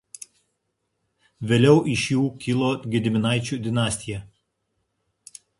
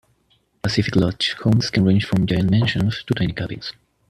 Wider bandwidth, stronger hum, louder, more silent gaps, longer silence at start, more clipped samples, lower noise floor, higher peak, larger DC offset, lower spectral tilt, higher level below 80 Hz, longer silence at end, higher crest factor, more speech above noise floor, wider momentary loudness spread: about the same, 11.5 kHz vs 12 kHz; neither; about the same, -22 LUFS vs -20 LUFS; neither; first, 1.4 s vs 0.65 s; neither; first, -76 dBFS vs -63 dBFS; about the same, -4 dBFS vs -4 dBFS; neither; about the same, -5.5 dB/octave vs -6.5 dB/octave; second, -54 dBFS vs -44 dBFS; first, 1.35 s vs 0.4 s; about the same, 20 dB vs 16 dB; first, 55 dB vs 44 dB; first, 19 LU vs 10 LU